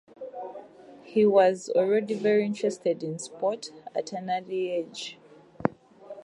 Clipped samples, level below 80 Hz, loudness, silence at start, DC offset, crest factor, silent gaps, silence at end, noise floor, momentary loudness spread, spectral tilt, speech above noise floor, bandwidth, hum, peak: under 0.1%; -70 dBFS; -27 LUFS; 0.2 s; under 0.1%; 22 dB; none; 0.05 s; -49 dBFS; 18 LU; -5.5 dB/octave; 23 dB; 11 kHz; none; -6 dBFS